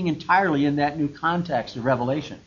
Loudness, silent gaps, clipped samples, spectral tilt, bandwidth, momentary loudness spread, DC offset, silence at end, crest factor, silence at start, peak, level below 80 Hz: -23 LUFS; none; under 0.1%; -7 dB/octave; 7.2 kHz; 6 LU; under 0.1%; 0.1 s; 16 dB; 0 s; -6 dBFS; -54 dBFS